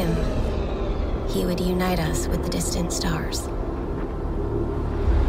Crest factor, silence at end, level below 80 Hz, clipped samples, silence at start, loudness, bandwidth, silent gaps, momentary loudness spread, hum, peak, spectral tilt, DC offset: 12 dB; 0 s; -28 dBFS; under 0.1%; 0 s; -26 LUFS; 16 kHz; none; 6 LU; none; -10 dBFS; -5.5 dB/octave; under 0.1%